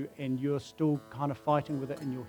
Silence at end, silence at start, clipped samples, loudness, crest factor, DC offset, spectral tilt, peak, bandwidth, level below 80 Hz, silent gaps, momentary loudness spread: 0 s; 0 s; under 0.1%; -33 LUFS; 18 dB; under 0.1%; -8 dB/octave; -14 dBFS; 19 kHz; -68 dBFS; none; 6 LU